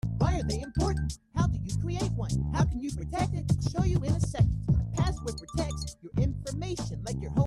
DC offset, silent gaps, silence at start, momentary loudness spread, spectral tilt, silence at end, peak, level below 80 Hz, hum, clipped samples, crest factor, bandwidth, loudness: under 0.1%; none; 0.05 s; 7 LU; -6.5 dB/octave; 0 s; -12 dBFS; -36 dBFS; none; under 0.1%; 16 dB; 12.5 kHz; -30 LUFS